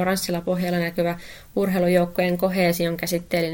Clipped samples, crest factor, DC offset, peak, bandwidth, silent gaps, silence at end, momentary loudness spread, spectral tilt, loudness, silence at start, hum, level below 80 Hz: under 0.1%; 16 dB; under 0.1%; -6 dBFS; 17 kHz; none; 0 s; 6 LU; -5.5 dB/octave; -23 LUFS; 0 s; none; -50 dBFS